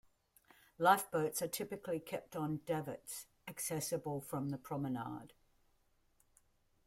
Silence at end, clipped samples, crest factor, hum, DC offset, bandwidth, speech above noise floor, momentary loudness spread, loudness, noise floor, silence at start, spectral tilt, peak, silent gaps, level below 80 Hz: 1.6 s; under 0.1%; 24 dB; none; under 0.1%; 16.5 kHz; 36 dB; 15 LU; -39 LUFS; -75 dBFS; 0.8 s; -4.5 dB/octave; -16 dBFS; none; -74 dBFS